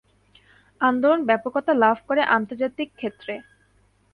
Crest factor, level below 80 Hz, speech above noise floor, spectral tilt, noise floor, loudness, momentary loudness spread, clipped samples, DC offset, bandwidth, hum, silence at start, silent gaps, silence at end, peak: 18 dB; -66 dBFS; 40 dB; -7 dB/octave; -61 dBFS; -22 LUFS; 13 LU; under 0.1%; under 0.1%; 5 kHz; 50 Hz at -55 dBFS; 0.8 s; none; 0.75 s; -6 dBFS